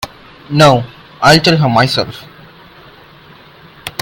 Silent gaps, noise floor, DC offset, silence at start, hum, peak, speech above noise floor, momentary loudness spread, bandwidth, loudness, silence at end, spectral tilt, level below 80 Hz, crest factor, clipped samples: none; -40 dBFS; under 0.1%; 0 s; none; 0 dBFS; 30 dB; 21 LU; 17 kHz; -11 LUFS; 0.1 s; -5 dB/octave; -44 dBFS; 14 dB; 0.4%